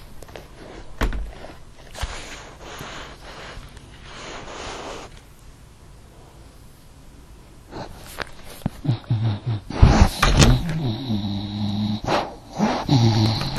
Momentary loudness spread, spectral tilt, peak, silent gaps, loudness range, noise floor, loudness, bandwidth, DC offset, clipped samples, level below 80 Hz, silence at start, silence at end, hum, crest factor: 24 LU; -5.5 dB/octave; 0 dBFS; none; 19 LU; -45 dBFS; -22 LUFS; 13.5 kHz; under 0.1%; under 0.1%; -30 dBFS; 0 s; 0 s; none; 24 dB